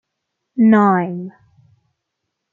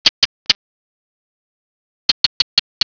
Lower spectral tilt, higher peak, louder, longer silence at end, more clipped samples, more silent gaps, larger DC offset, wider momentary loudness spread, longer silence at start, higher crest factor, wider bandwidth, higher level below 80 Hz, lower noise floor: first, -10 dB/octave vs 0.5 dB/octave; about the same, -2 dBFS vs 0 dBFS; about the same, -15 LUFS vs -16 LUFS; first, 1.25 s vs 0.1 s; second, under 0.1% vs 0.1%; second, none vs 0.09-0.46 s, 0.55-2.81 s; neither; first, 18 LU vs 4 LU; first, 0.55 s vs 0.05 s; about the same, 16 dB vs 20 dB; second, 3.9 kHz vs 5.4 kHz; second, -68 dBFS vs -58 dBFS; second, -77 dBFS vs under -90 dBFS